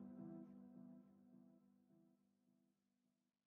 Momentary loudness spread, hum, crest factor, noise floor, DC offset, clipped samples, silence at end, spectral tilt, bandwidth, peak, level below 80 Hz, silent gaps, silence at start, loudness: 12 LU; none; 18 dB; -89 dBFS; under 0.1%; under 0.1%; 0.35 s; -9.5 dB/octave; 2.6 kHz; -46 dBFS; under -90 dBFS; none; 0 s; -61 LUFS